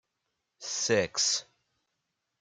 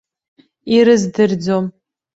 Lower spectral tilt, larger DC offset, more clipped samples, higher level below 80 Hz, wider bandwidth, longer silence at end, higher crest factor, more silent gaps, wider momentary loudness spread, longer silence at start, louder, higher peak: second, -1.5 dB/octave vs -6 dB/octave; neither; neither; second, -72 dBFS vs -58 dBFS; first, 11 kHz vs 8 kHz; first, 1 s vs 0.45 s; first, 20 dB vs 14 dB; neither; second, 10 LU vs 13 LU; about the same, 0.6 s vs 0.65 s; second, -28 LUFS vs -15 LUFS; second, -14 dBFS vs -2 dBFS